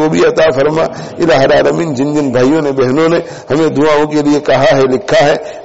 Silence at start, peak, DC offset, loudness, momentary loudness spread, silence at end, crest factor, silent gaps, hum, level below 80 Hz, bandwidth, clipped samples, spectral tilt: 0 s; -2 dBFS; 1%; -11 LUFS; 5 LU; 0 s; 8 dB; none; none; -42 dBFS; 8 kHz; under 0.1%; -4.5 dB/octave